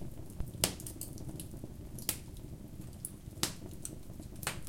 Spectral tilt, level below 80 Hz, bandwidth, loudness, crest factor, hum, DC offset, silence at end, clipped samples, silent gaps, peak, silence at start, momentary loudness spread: -3 dB/octave; -52 dBFS; 17 kHz; -41 LUFS; 36 dB; none; under 0.1%; 0 s; under 0.1%; none; -6 dBFS; 0 s; 14 LU